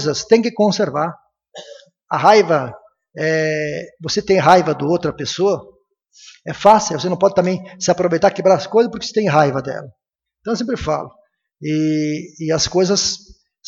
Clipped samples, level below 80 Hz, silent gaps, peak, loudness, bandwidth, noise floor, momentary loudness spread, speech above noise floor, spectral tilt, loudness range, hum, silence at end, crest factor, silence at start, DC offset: under 0.1%; -50 dBFS; none; 0 dBFS; -17 LUFS; 9.2 kHz; -42 dBFS; 14 LU; 26 dB; -4.5 dB/octave; 4 LU; none; 0.5 s; 18 dB; 0 s; under 0.1%